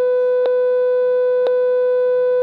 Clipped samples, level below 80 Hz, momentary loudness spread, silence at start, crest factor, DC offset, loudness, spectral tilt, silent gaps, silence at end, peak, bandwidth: under 0.1%; -86 dBFS; 0 LU; 0 s; 6 dB; under 0.1%; -16 LUFS; -5 dB/octave; none; 0 s; -10 dBFS; 4.7 kHz